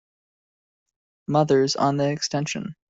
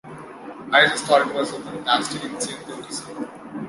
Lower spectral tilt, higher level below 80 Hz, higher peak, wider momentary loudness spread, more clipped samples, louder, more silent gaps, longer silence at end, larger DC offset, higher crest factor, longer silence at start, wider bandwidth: first, -5 dB/octave vs -2.5 dB/octave; about the same, -64 dBFS vs -64 dBFS; second, -6 dBFS vs -2 dBFS; second, 9 LU vs 20 LU; neither; about the same, -22 LUFS vs -21 LUFS; neither; first, 0.15 s vs 0 s; neither; about the same, 20 dB vs 22 dB; first, 1.3 s vs 0.05 s; second, 8 kHz vs 11.5 kHz